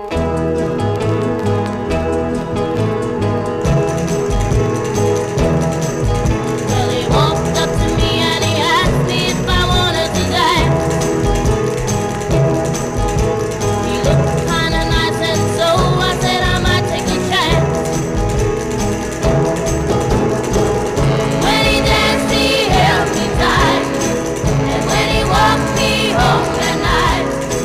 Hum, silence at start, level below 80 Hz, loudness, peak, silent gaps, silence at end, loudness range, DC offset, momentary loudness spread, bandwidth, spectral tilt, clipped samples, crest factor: none; 0 s; -26 dBFS; -15 LUFS; -2 dBFS; none; 0 s; 3 LU; 0.2%; 5 LU; 16 kHz; -5 dB/octave; under 0.1%; 14 dB